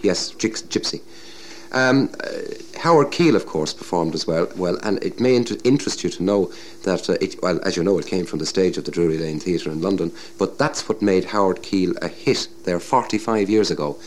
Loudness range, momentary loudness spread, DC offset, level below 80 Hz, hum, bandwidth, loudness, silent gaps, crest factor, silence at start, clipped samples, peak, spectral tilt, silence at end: 2 LU; 8 LU; 1%; -56 dBFS; none; 14.5 kHz; -21 LUFS; none; 16 dB; 0 s; under 0.1%; -4 dBFS; -5 dB/octave; 0 s